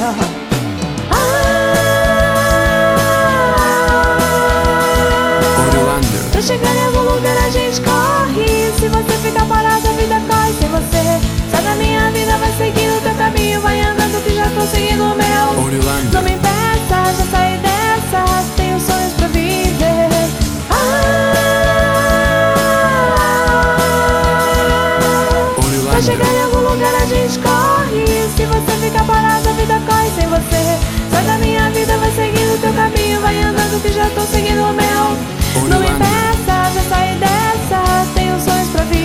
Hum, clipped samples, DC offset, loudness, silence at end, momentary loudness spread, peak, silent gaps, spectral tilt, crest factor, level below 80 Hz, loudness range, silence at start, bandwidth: none; under 0.1%; under 0.1%; -13 LUFS; 0 s; 3 LU; 0 dBFS; none; -4.5 dB/octave; 12 dB; -22 dBFS; 2 LU; 0 s; 16.5 kHz